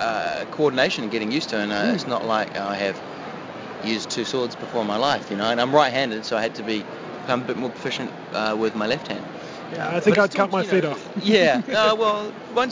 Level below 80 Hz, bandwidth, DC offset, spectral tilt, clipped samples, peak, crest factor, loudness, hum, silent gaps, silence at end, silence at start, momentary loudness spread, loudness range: -62 dBFS; 7.6 kHz; under 0.1%; -4.5 dB/octave; under 0.1%; -4 dBFS; 20 dB; -23 LUFS; none; none; 0 s; 0 s; 13 LU; 5 LU